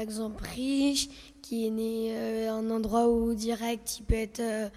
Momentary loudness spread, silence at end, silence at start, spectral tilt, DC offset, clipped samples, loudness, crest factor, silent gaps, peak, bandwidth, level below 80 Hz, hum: 9 LU; 0 s; 0 s; -4.5 dB/octave; under 0.1%; under 0.1%; -30 LUFS; 16 dB; none; -14 dBFS; 16 kHz; -44 dBFS; none